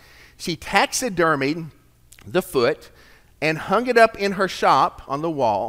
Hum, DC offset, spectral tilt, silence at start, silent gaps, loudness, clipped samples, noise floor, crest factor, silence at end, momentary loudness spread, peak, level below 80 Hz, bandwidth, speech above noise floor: none; under 0.1%; -4 dB/octave; 0.4 s; none; -20 LUFS; under 0.1%; -50 dBFS; 22 dB; 0 s; 13 LU; 0 dBFS; -52 dBFS; 16 kHz; 30 dB